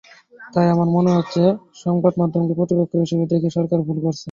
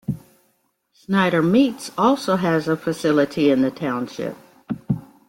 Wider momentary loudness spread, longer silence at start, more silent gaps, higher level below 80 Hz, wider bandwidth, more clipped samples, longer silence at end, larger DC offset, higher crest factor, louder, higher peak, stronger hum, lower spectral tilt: second, 6 LU vs 13 LU; first, 0.4 s vs 0.1 s; neither; about the same, -58 dBFS vs -56 dBFS; second, 7.4 kHz vs 16.5 kHz; neither; second, 0 s vs 0.3 s; neither; about the same, 16 dB vs 16 dB; about the same, -19 LUFS vs -20 LUFS; about the same, -4 dBFS vs -4 dBFS; neither; first, -8.5 dB/octave vs -6.5 dB/octave